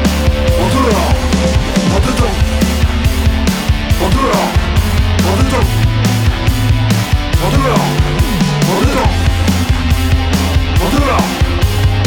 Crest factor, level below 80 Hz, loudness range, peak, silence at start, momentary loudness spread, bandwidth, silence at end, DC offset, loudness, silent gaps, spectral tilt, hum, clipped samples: 10 dB; -16 dBFS; 0 LU; -2 dBFS; 0 s; 2 LU; 19.5 kHz; 0 s; under 0.1%; -13 LUFS; none; -5.5 dB/octave; none; under 0.1%